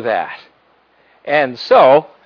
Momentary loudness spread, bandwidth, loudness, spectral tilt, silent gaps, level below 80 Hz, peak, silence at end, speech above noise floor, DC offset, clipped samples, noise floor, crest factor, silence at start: 23 LU; 5.4 kHz; -13 LUFS; -6 dB/octave; none; -66 dBFS; 0 dBFS; 0.25 s; 42 dB; under 0.1%; under 0.1%; -55 dBFS; 14 dB; 0 s